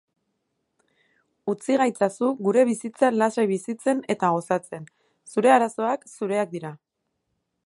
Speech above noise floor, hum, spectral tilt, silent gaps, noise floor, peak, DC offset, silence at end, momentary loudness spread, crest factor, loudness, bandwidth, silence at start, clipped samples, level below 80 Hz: 55 dB; none; -5.5 dB/octave; none; -77 dBFS; -4 dBFS; under 0.1%; 0.9 s; 11 LU; 20 dB; -23 LUFS; 11.5 kHz; 1.45 s; under 0.1%; -78 dBFS